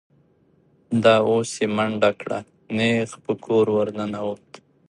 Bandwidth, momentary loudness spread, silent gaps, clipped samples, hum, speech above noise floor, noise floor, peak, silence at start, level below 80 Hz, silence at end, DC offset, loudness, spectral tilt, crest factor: 11.5 kHz; 13 LU; none; under 0.1%; none; 39 dB; -60 dBFS; -2 dBFS; 0.9 s; -62 dBFS; 0.55 s; under 0.1%; -22 LUFS; -5.5 dB/octave; 20 dB